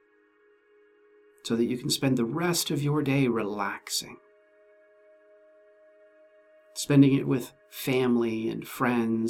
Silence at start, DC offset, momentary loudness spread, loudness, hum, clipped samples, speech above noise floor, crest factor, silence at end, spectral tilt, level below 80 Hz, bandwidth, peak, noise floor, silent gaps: 1.45 s; under 0.1%; 13 LU; -26 LUFS; none; under 0.1%; 37 dB; 20 dB; 0 s; -5 dB/octave; -66 dBFS; 18.5 kHz; -8 dBFS; -63 dBFS; none